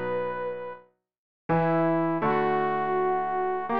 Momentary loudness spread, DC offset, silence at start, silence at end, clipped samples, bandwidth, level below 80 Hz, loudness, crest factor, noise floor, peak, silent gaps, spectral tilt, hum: 13 LU; 0.5%; 0 s; 0 s; under 0.1%; 5.2 kHz; -62 dBFS; -26 LUFS; 12 dB; -50 dBFS; -14 dBFS; 1.18-1.49 s; -10 dB/octave; none